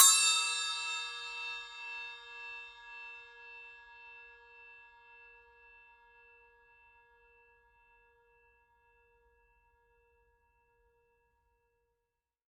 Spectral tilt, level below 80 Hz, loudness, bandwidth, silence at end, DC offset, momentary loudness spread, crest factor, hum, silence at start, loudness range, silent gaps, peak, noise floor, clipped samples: 6 dB/octave; -78 dBFS; -32 LUFS; 13.5 kHz; 7.75 s; under 0.1%; 26 LU; 32 dB; none; 0 s; 25 LU; none; -6 dBFS; -88 dBFS; under 0.1%